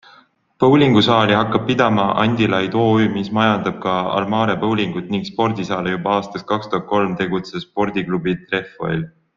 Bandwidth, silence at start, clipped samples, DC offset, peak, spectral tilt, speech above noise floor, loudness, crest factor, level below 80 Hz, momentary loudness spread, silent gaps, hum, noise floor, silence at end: 7.4 kHz; 0.6 s; under 0.1%; under 0.1%; -2 dBFS; -7 dB/octave; 34 dB; -18 LUFS; 16 dB; -52 dBFS; 10 LU; none; none; -51 dBFS; 0.3 s